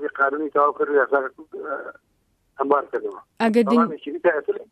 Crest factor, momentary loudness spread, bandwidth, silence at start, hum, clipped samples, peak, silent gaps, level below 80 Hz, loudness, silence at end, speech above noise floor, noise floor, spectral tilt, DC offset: 18 dB; 13 LU; 12 kHz; 0 s; none; under 0.1%; -4 dBFS; none; -72 dBFS; -22 LUFS; 0.1 s; 45 dB; -67 dBFS; -6.5 dB/octave; under 0.1%